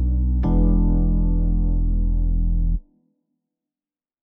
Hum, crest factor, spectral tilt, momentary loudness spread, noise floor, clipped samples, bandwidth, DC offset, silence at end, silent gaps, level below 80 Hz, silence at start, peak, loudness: none; 12 dB; -13 dB/octave; 5 LU; under -90 dBFS; under 0.1%; 1.3 kHz; under 0.1%; 1.4 s; none; -20 dBFS; 0 s; -8 dBFS; -22 LUFS